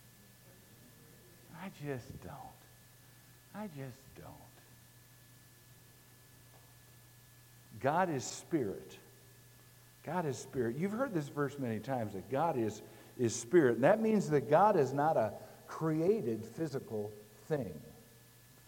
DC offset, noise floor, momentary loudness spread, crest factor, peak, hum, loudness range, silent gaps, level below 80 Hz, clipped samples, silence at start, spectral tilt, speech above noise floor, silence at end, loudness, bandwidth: under 0.1%; -60 dBFS; 24 LU; 22 dB; -16 dBFS; none; 21 LU; none; -72 dBFS; under 0.1%; 1.5 s; -6 dB/octave; 26 dB; 0.65 s; -34 LUFS; 17 kHz